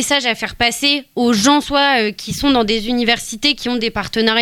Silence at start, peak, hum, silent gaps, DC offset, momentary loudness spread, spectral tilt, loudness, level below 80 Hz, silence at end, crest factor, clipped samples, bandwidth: 0 s; -2 dBFS; none; none; under 0.1%; 6 LU; -2.5 dB/octave; -15 LUFS; -40 dBFS; 0 s; 14 dB; under 0.1%; 17.5 kHz